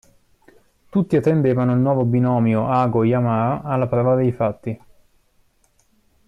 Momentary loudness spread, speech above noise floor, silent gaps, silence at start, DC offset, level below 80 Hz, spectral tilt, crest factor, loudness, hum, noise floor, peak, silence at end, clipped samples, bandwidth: 6 LU; 43 dB; none; 0.95 s; under 0.1%; -52 dBFS; -10 dB/octave; 12 dB; -19 LUFS; none; -61 dBFS; -8 dBFS; 1.5 s; under 0.1%; 7 kHz